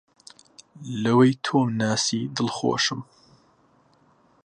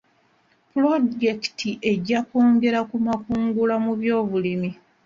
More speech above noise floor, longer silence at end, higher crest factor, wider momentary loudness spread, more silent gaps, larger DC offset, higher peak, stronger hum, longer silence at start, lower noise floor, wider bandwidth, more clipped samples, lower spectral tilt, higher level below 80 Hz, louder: about the same, 38 dB vs 41 dB; first, 1.4 s vs 0.3 s; first, 20 dB vs 14 dB; first, 13 LU vs 8 LU; neither; neither; about the same, -6 dBFS vs -8 dBFS; neither; about the same, 0.8 s vs 0.75 s; about the same, -61 dBFS vs -62 dBFS; first, 10.5 kHz vs 7.4 kHz; neither; second, -4.5 dB/octave vs -6.5 dB/octave; second, -68 dBFS vs -58 dBFS; about the same, -23 LUFS vs -22 LUFS